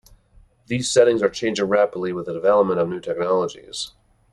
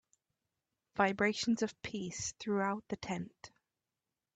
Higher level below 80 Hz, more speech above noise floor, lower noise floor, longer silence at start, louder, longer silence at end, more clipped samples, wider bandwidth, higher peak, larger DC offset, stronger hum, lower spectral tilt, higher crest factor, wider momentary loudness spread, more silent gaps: first, -56 dBFS vs -70 dBFS; second, 34 dB vs over 54 dB; second, -54 dBFS vs under -90 dBFS; second, 0.7 s vs 0.95 s; first, -21 LUFS vs -36 LUFS; second, 0.45 s vs 0.9 s; neither; first, 11.5 kHz vs 9 kHz; first, -2 dBFS vs -16 dBFS; neither; neither; about the same, -4.5 dB/octave vs -4 dB/octave; about the same, 18 dB vs 22 dB; about the same, 13 LU vs 11 LU; neither